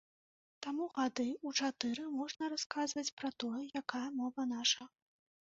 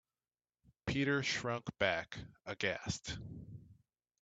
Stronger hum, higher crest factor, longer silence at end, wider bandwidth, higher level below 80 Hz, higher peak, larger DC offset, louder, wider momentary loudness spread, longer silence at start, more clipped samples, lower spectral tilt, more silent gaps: neither; about the same, 24 dB vs 24 dB; about the same, 0.6 s vs 0.5 s; second, 7.6 kHz vs 9 kHz; second, -82 dBFS vs -62 dBFS; about the same, -16 dBFS vs -16 dBFS; neither; about the same, -38 LUFS vs -38 LUFS; second, 7 LU vs 16 LU; second, 0.6 s vs 0.85 s; neither; second, -0.5 dB/octave vs -4 dB/octave; first, 2.66-2.70 s, 3.12-3.17 s vs none